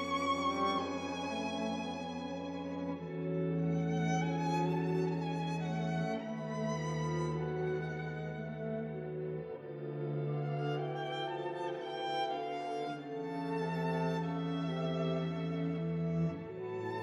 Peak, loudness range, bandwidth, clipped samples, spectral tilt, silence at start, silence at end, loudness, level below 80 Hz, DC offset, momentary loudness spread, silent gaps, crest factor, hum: -22 dBFS; 4 LU; 8.4 kHz; under 0.1%; -7 dB/octave; 0 s; 0 s; -37 LUFS; -66 dBFS; under 0.1%; 7 LU; none; 14 dB; none